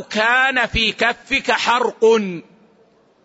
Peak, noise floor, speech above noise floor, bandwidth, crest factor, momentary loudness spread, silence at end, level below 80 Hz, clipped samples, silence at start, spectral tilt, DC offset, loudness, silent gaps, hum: -4 dBFS; -55 dBFS; 37 dB; 8 kHz; 16 dB; 5 LU; 0.85 s; -42 dBFS; under 0.1%; 0 s; -3.5 dB/octave; under 0.1%; -16 LUFS; none; none